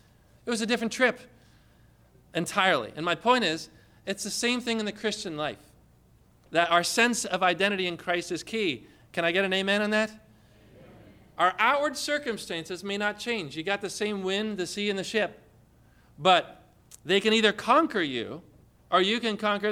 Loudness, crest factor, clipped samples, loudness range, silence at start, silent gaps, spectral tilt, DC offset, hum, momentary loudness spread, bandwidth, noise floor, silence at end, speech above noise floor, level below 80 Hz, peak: -27 LUFS; 20 dB; under 0.1%; 4 LU; 0.45 s; none; -3 dB/octave; under 0.1%; none; 12 LU; 16.5 kHz; -60 dBFS; 0 s; 33 dB; -64 dBFS; -10 dBFS